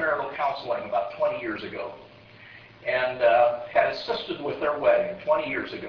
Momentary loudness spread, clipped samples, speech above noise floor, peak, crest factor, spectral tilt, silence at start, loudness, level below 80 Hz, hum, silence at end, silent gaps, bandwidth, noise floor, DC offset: 13 LU; under 0.1%; 23 dB; -8 dBFS; 18 dB; -6 dB/octave; 0 s; -25 LUFS; -60 dBFS; none; 0 s; none; 5.4 kHz; -48 dBFS; under 0.1%